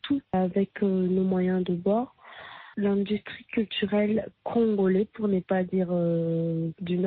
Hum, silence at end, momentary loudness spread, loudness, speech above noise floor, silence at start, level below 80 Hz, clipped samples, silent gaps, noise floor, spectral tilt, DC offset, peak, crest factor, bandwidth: none; 0 s; 7 LU; -27 LUFS; 20 dB; 0.05 s; -62 dBFS; under 0.1%; none; -45 dBFS; -6.5 dB/octave; under 0.1%; -14 dBFS; 12 dB; 4.3 kHz